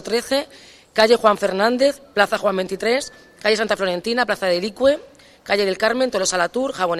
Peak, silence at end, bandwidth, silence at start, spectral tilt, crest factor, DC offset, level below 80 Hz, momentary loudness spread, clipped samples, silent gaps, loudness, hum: 0 dBFS; 0 s; 14.5 kHz; 0 s; -3 dB/octave; 20 dB; under 0.1%; -56 dBFS; 7 LU; under 0.1%; none; -19 LUFS; none